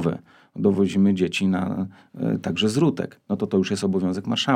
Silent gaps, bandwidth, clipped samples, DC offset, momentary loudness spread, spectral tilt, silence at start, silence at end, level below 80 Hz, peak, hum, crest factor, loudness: none; 11.5 kHz; under 0.1%; under 0.1%; 10 LU; -6 dB/octave; 0 s; 0 s; -62 dBFS; -6 dBFS; none; 16 dB; -23 LUFS